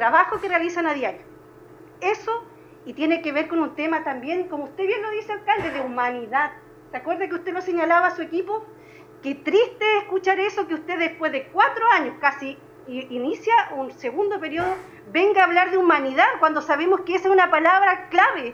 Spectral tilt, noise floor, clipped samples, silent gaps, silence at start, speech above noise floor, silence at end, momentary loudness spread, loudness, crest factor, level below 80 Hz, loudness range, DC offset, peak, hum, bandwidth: -4.5 dB/octave; -46 dBFS; under 0.1%; none; 0 s; 25 dB; 0 s; 12 LU; -21 LUFS; 18 dB; -62 dBFS; 7 LU; under 0.1%; -4 dBFS; none; 7.4 kHz